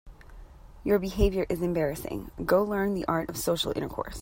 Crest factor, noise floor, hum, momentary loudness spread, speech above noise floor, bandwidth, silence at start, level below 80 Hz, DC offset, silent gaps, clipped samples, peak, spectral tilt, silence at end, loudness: 20 dB; -47 dBFS; none; 10 LU; 20 dB; 16.5 kHz; 0.05 s; -40 dBFS; under 0.1%; none; under 0.1%; -8 dBFS; -5.5 dB/octave; 0 s; -28 LUFS